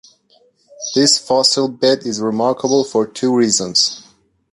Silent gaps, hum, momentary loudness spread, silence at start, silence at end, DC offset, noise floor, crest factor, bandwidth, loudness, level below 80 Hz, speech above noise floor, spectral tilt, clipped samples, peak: none; none; 7 LU; 0.8 s; 0.5 s; under 0.1%; -55 dBFS; 16 dB; 11.5 kHz; -15 LUFS; -60 dBFS; 40 dB; -3 dB/octave; under 0.1%; -2 dBFS